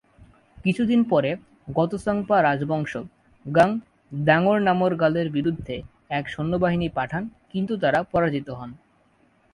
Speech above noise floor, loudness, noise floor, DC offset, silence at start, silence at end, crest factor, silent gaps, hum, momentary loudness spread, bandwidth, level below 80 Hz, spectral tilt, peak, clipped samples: 39 dB; -23 LUFS; -61 dBFS; under 0.1%; 0.2 s; 0.75 s; 20 dB; none; none; 14 LU; 11 kHz; -52 dBFS; -7.5 dB/octave; -4 dBFS; under 0.1%